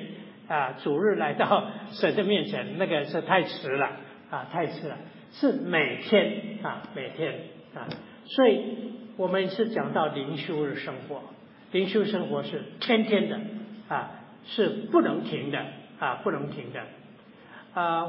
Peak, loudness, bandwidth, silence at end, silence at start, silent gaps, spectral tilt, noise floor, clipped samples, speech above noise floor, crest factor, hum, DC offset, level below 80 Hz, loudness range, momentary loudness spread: -8 dBFS; -28 LUFS; 5.8 kHz; 0 s; 0 s; none; -9.5 dB/octave; -51 dBFS; under 0.1%; 24 dB; 20 dB; none; under 0.1%; -80 dBFS; 3 LU; 16 LU